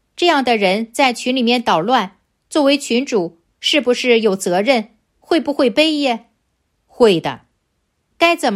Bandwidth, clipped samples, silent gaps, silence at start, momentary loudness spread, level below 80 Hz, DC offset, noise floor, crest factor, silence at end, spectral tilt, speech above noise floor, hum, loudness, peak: 15 kHz; under 0.1%; none; 0.2 s; 7 LU; -60 dBFS; under 0.1%; -68 dBFS; 16 dB; 0 s; -4 dB/octave; 53 dB; none; -16 LUFS; 0 dBFS